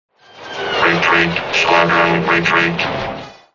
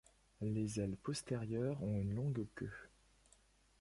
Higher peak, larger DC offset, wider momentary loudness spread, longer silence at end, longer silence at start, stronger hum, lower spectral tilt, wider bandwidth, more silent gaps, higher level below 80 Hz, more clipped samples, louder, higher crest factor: first, 0 dBFS vs -28 dBFS; first, 0.2% vs under 0.1%; first, 13 LU vs 8 LU; second, 0.2 s vs 0.95 s; about the same, 0.35 s vs 0.4 s; neither; second, -4.5 dB/octave vs -6.5 dB/octave; second, 7.4 kHz vs 11.5 kHz; neither; first, -46 dBFS vs -62 dBFS; neither; first, -14 LUFS vs -42 LUFS; about the same, 16 dB vs 14 dB